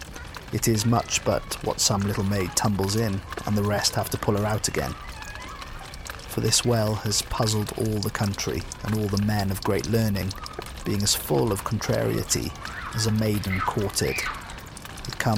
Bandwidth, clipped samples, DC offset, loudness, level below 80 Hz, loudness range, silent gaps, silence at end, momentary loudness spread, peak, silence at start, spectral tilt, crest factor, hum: 17 kHz; under 0.1%; under 0.1%; -25 LUFS; -42 dBFS; 2 LU; none; 0 s; 14 LU; -8 dBFS; 0 s; -4 dB/octave; 18 dB; none